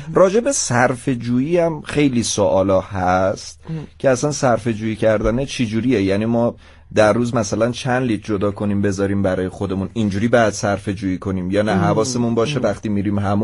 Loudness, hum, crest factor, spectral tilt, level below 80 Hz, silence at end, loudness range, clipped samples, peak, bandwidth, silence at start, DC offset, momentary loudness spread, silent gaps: -18 LUFS; none; 16 dB; -5.5 dB/octave; -42 dBFS; 0 s; 2 LU; under 0.1%; -2 dBFS; 11.5 kHz; 0 s; under 0.1%; 7 LU; none